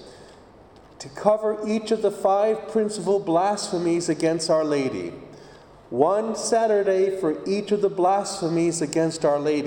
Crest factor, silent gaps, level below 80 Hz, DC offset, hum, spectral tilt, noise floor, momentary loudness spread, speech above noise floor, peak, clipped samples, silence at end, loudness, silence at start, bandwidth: 20 dB; none; -62 dBFS; under 0.1%; none; -5 dB/octave; -49 dBFS; 6 LU; 27 dB; -4 dBFS; under 0.1%; 0 s; -23 LUFS; 0 s; 17 kHz